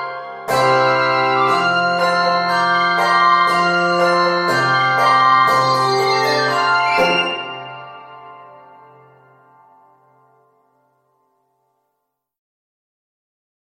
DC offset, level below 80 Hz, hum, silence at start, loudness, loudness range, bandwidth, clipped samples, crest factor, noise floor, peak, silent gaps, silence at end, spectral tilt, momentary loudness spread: under 0.1%; -62 dBFS; none; 0 s; -15 LUFS; 7 LU; 16 kHz; under 0.1%; 16 dB; -75 dBFS; -2 dBFS; none; 5.3 s; -4 dB/octave; 9 LU